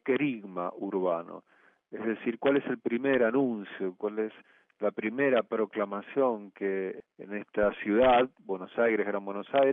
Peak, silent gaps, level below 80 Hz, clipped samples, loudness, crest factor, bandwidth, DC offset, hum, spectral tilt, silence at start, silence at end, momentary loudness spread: -12 dBFS; none; -62 dBFS; under 0.1%; -30 LUFS; 16 dB; 3.9 kHz; under 0.1%; none; -9 dB/octave; 0.05 s; 0 s; 11 LU